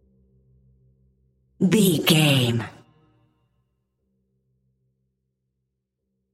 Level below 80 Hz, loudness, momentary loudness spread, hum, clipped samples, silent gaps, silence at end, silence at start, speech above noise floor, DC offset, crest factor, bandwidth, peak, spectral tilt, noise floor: -64 dBFS; -19 LUFS; 11 LU; none; under 0.1%; none; 3.65 s; 1.6 s; 60 dB; under 0.1%; 22 dB; 16 kHz; -4 dBFS; -5 dB/octave; -79 dBFS